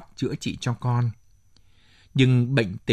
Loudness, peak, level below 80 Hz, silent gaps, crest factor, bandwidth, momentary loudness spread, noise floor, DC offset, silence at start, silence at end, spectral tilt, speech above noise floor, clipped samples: -24 LUFS; -4 dBFS; -54 dBFS; none; 20 dB; 9.8 kHz; 10 LU; -55 dBFS; under 0.1%; 0 s; 0 s; -6.5 dB/octave; 33 dB; under 0.1%